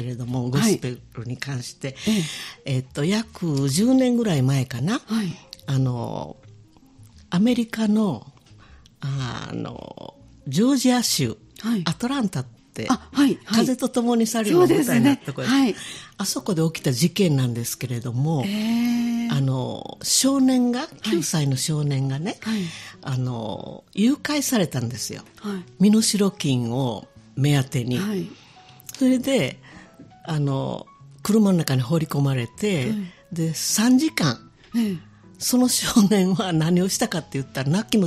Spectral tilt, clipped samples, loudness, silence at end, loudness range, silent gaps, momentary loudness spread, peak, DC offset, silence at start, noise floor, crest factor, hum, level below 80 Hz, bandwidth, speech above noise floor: -5 dB/octave; under 0.1%; -22 LUFS; 0 s; 5 LU; none; 14 LU; 0 dBFS; under 0.1%; 0 s; -50 dBFS; 22 dB; none; -56 dBFS; 15 kHz; 28 dB